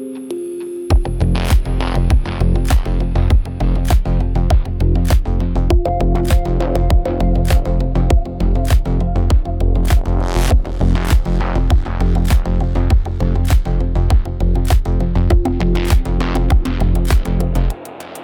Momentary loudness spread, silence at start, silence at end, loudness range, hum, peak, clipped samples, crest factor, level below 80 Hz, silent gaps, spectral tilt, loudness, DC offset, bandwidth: 3 LU; 0 s; 0 s; 0 LU; none; -2 dBFS; under 0.1%; 12 dB; -16 dBFS; none; -7 dB/octave; -17 LUFS; under 0.1%; 16.5 kHz